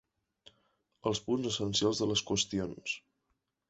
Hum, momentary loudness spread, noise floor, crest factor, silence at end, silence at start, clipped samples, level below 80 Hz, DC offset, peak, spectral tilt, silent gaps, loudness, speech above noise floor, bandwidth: none; 9 LU; -81 dBFS; 20 dB; 0.7 s; 1.05 s; under 0.1%; -62 dBFS; under 0.1%; -16 dBFS; -3.5 dB/octave; none; -33 LUFS; 49 dB; 8.4 kHz